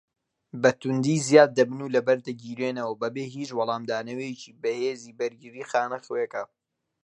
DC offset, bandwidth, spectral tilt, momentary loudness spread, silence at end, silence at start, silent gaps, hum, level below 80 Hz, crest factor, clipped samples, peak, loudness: under 0.1%; 11 kHz; -5 dB/octave; 15 LU; 0.6 s; 0.55 s; none; none; -74 dBFS; 24 dB; under 0.1%; -2 dBFS; -26 LUFS